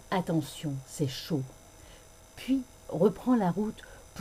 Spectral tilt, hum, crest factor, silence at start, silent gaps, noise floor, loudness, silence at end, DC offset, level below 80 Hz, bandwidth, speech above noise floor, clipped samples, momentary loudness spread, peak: -6.5 dB/octave; none; 20 dB; 0.05 s; none; -53 dBFS; -31 LUFS; 0 s; under 0.1%; -56 dBFS; 15.5 kHz; 23 dB; under 0.1%; 20 LU; -12 dBFS